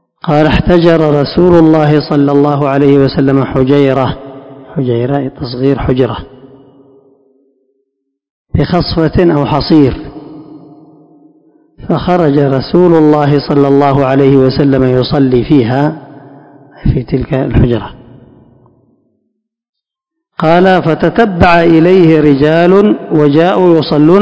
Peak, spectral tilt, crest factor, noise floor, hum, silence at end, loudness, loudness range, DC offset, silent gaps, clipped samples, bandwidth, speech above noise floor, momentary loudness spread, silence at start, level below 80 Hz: 0 dBFS; -9 dB/octave; 10 dB; -76 dBFS; none; 0 s; -9 LUFS; 9 LU; under 0.1%; 8.30-8.45 s, 19.69-19.73 s; 3%; 8 kHz; 68 dB; 9 LU; 0.25 s; -30 dBFS